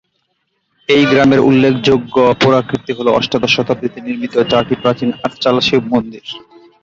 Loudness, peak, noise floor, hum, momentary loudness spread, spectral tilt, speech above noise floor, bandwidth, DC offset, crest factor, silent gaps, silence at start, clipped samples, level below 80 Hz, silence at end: -13 LUFS; 0 dBFS; -66 dBFS; none; 12 LU; -6 dB/octave; 53 dB; 7.6 kHz; under 0.1%; 14 dB; none; 0.9 s; under 0.1%; -46 dBFS; 0.45 s